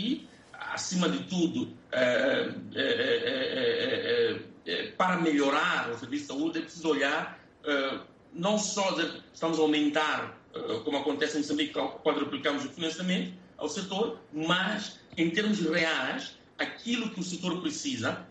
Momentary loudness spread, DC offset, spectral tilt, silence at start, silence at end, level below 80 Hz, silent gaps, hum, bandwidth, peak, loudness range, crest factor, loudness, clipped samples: 10 LU; under 0.1%; -4 dB/octave; 0 s; 0 s; -70 dBFS; none; none; 8.8 kHz; -14 dBFS; 3 LU; 16 dB; -30 LUFS; under 0.1%